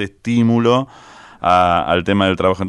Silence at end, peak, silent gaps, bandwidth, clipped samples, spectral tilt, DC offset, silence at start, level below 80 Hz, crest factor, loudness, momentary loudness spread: 0 s; -2 dBFS; none; 10.5 kHz; under 0.1%; -6.5 dB/octave; under 0.1%; 0 s; -44 dBFS; 14 dB; -15 LUFS; 6 LU